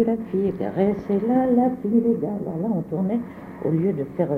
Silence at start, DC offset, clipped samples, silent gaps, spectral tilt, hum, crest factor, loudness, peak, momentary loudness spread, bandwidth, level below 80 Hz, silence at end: 0 s; under 0.1%; under 0.1%; none; -11 dB/octave; none; 14 dB; -23 LUFS; -8 dBFS; 7 LU; 4.1 kHz; -54 dBFS; 0 s